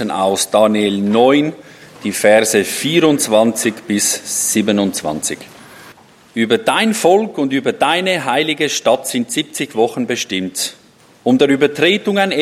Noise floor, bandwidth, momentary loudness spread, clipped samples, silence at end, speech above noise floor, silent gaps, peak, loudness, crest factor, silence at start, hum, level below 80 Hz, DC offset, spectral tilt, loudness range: -43 dBFS; 16 kHz; 9 LU; under 0.1%; 0 s; 29 dB; none; 0 dBFS; -15 LUFS; 16 dB; 0 s; none; -62 dBFS; under 0.1%; -3.5 dB/octave; 3 LU